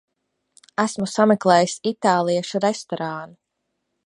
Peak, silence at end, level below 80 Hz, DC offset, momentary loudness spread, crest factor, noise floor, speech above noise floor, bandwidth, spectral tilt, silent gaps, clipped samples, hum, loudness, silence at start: -2 dBFS; 0.8 s; -68 dBFS; under 0.1%; 12 LU; 20 dB; -76 dBFS; 56 dB; 11.5 kHz; -5 dB/octave; none; under 0.1%; none; -21 LUFS; 0.8 s